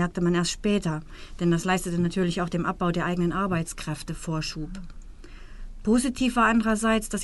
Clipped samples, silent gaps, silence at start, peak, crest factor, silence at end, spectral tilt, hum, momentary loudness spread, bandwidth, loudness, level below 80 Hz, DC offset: under 0.1%; none; 0 s; -10 dBFS; 16 dB; 0 s; -5.5 dB/octave; none; 11 LU; 11.5 kHz; -26 LUFS; -40 dBFS; under 0.1%